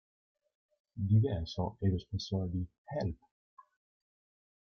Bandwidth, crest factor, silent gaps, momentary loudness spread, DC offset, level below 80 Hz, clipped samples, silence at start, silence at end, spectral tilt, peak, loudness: 6.6 kHz; 20 dB; 2.78-2.85 s; 11 LU; under 0.1%; -58 dBFS; under 0.1%; 0.95 s; 1.5 s; -8 dB/octave; -18 dBFS; -35 LUFS